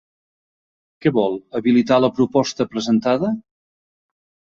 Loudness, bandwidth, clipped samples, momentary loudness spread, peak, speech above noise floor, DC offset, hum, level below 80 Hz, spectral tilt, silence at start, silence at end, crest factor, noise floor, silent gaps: -19 LUFS; 7.4 kHz; under 0.1%; 7 LU; -2 dBFS; over 72 dB; under 0.1%; none; -58 dBFS; -6 dB/octave; 1.05 s; 1.2 s; 18 dB; under -90 dBFS; none